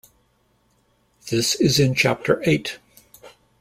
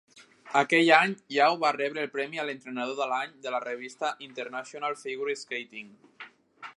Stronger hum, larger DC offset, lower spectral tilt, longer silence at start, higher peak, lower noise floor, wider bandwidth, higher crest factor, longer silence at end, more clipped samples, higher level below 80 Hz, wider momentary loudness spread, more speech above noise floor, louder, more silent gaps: neither; neither; about the same, -4.5 dB/octave vs -4 dB/octave; first, 1.25 s vs 0.15 s; about the same, -4 dBFS vs -4 dBFS; first, -64 dBFS vs -51 dBFS; first, 16.5 kHz vs 11.5 kHz; second, 20 dB vs 26 dB; first, 0.3 s vs 0.05 s; neither; first, -54 dBFS vs -86 dBFS; second, 17 LU vs 20 LU; first, 44 dB vs 22 dB; first, -20 LUFS vs -28 LUFS; neither